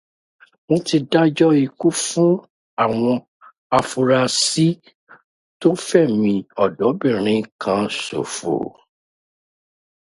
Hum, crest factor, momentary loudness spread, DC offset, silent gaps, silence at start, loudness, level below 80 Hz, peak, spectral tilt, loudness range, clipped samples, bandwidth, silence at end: none; 20 dB; 8 LU; under 0.1%; 2.50-2.77 s, 3.28-3.40 s, 3.58-3.70 s, 4.95-5.07 s, 5.24-5.60 s, 7.52-7.59 s; 0.7 s; -19 LUFS; -60 dBFS; 0 dBFS; -5 dB/octave; 3 LU; under 0.1%; 11.5 kHz; 1.4 s